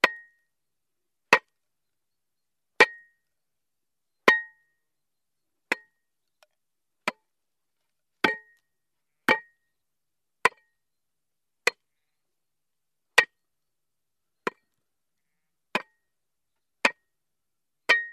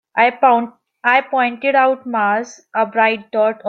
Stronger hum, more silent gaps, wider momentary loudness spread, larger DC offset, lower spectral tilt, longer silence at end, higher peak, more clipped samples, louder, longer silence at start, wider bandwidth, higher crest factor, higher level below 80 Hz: neither; neither; first, 15 LU vs 7 LU; neither; second, -2 dB/octave vs -4.5 dB/octave; about the same, 0 s vs 0 s; about the same, -2 dBFS vs -2 dBFS; neither; second, -26 LUFS vs -16 LUFS; about the same, 0.05 s vs 0.15 s; first, 13.5 kHz vs 7.6 kHz; first, 30 dB vs 16 dB; second, -80 dBFS vs -72 dBFS